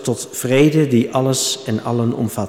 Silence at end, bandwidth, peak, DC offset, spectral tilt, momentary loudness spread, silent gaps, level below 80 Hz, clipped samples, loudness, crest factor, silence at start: 0 s; 17.5 kHz; -4 dBFS; under 0.1%; -5 dB/octave; 8 LU; none; -56 dBFS; under 0.1%; -17 LUFS; 14 dB; 0 s